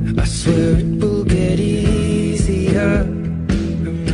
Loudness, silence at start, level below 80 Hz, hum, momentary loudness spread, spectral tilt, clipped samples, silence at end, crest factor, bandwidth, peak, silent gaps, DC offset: -17 LUFS; 0 s; -26 dBFS; none; 5 LU; -6.5 dB/octave; under 0.1%; 0 s; 14 dB; 11 kHz; -2 dBFS; none; under 0.1%